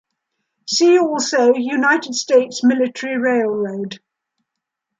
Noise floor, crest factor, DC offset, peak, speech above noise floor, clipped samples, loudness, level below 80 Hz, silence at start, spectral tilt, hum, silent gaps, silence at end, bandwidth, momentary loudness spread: -80 dBFS; 16 dB; under 0.1%; -2 dBFS; 64 dB; under 0.1%; -16 LUFS; -74 dBFS; 0.65 s; -3 dB/octave; none; none; 1 s; 9.4 kHz; 12 LU